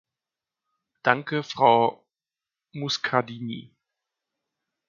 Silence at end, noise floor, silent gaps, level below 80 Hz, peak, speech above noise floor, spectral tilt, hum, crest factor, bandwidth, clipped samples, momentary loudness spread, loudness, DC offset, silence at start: 1.3 s; under -90 dBFS; none; -74 dBFS; -2 dBFS; over 66 dB; -4.5 dB/octave; none; 26 dB; 7.4 kHz; under 0.1%; 16 LU; -24 LUFS; under 0.1%; 1.05 s